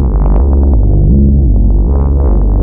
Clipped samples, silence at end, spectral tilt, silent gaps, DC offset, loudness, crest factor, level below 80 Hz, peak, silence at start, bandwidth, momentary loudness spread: under 0.1%; 0 s; -15 dB/octave; none; under 0.1%; -10 LUFS; 6 dB; -8 dBFS; -2 dBFS; 0 s; 1.6 kHz; 3 LU